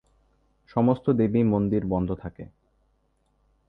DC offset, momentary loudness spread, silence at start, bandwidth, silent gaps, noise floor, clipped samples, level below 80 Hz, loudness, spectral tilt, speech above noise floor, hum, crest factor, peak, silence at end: under 0.1%; 13 LU; 0.75 s; 5 kHz; none; -69 dBFS; under 0.1%; -50 dBFS; -24 LUFS; -11.5 dB/octave; 45 dB; none; 18 dB; -10 dBFS; 1.25 s